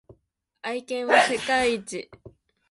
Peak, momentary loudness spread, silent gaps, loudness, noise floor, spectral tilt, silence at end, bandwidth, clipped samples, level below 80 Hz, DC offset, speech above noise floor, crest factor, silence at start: -6 dBFS; 17 LU; none; -23 LUFS; -69 dBFS; -2.5 dB/octave; 0.4 s; 11.5 kHz; under 0.1%; -60 dBFS; under 0.1%; 45 dB; 22 dB; 0.1 s